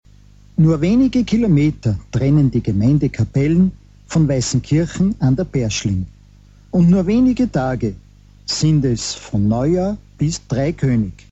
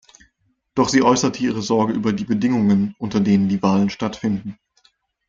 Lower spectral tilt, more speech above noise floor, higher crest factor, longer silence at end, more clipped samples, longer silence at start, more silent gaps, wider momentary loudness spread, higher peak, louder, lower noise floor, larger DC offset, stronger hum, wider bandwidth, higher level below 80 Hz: about the same, -6.5 dB/octave vs -5.5 dB/octave; second, 29 dB vs 48 dB; second, 12 dB vs 18 dB; second, 0.2 s vs 0.75 s; neither; second, 0.6 s vs 0.75 s; neither; about the same, 8 LU vs 8 LU; about the same, -4 dBFS vs -2 dBFS; about the same, -17 LUFS vs -19 LUFS; second, -45 dBFS vs -67 dBFS; neither; first, 50 Hz at -35 dBFS vs none; about the same, 8.2 kHz vs 7.6 kHz; first, -36 dBFS vs -54 dBFS